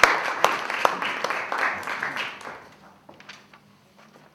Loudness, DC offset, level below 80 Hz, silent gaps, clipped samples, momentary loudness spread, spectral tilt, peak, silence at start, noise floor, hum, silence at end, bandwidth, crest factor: -25 LUFS; under 0.1%; -60 dBFS; none; under 0.1%; 22 LU; -1.5 dB/octave; 0 dBFS; 0 s; -54 dBFS; none; 0.75 s; 19 kHz; 28 dB